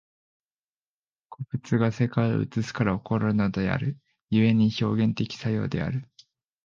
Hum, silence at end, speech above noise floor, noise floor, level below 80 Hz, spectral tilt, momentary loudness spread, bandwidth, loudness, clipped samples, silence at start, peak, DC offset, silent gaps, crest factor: none; 0.6 s; over 65 dB; under -90 dBFS; -52 dBFS; -7.5 dB/octave; 11 LU; 7.2 kHz; -26 LUFS; under 0.1%; 1.3 s; -8 dBFS; under 0.1%; 4.22-4.28 s; 18 dB